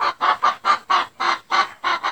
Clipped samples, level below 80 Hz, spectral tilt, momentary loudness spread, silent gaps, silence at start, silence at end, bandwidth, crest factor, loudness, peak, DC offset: under 0.1%; -68 dBFS; -0.5 dB/octave; 4 LU; none; 0 s; 0 s; over 20 kHz; 16 dB; -20 LUFS; -4 dBFS; 0.1%